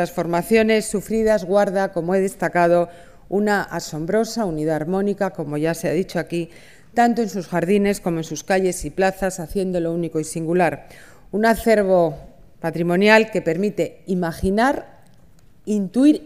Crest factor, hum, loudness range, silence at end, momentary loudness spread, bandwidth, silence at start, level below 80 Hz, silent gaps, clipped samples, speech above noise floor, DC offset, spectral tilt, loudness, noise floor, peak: 20 dB; none; 4 LU; 0 s; 10 LU; 15.5 kHz; 0 s; -44 dBFS; none; under 0.1%; 33 dB; 0.4%; -5.5 dB/octave; -20 LUFS; -52 dBFS; 0 dBFS